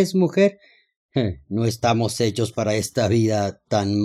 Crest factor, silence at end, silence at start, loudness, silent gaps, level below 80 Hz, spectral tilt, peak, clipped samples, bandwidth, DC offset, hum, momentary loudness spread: 16 dB; 0 s; 0 s; -22 LUFS; 0.96-1.09 s; -56 dBFS; -6 dB/octave; -4 dBFS; under 0.1%; 14.5 kHz; under 0.1%; none; 6 LU